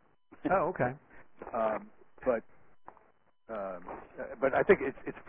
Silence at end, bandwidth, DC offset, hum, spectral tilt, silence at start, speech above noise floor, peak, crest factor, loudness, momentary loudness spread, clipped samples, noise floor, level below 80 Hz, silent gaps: 0 s; 3.7 kHz; under 0.1%; none; -5.5 dB/octave; 0.3 s; 37 dB; -10 dBFS; 24 dB; -32 LUFS; 17 LU; under 0.1%; -69 dBFS; -62 dBFS; none